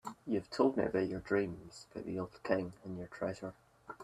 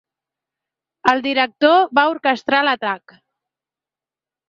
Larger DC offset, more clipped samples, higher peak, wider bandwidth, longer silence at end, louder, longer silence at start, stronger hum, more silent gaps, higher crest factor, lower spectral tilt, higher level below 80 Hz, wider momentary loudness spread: neither; neither; second, -16 dBFS vs -2 dBFS; first, 13 kHz vs 7.6 kHz; second, 0 s vs 1.5 s; second, -37 LUFS vs -17 LUFS; second, 0.05 s vs 1.05 s; second, none vs 50 Hz at -60 dBFS; neither; about the same, 22 dB vs 18 dB; first, -6.5 dB/octave vs -4 dB/octave; about the same, -66 dBFS vs -66 dBFS; first, 15 LU vs 8 LU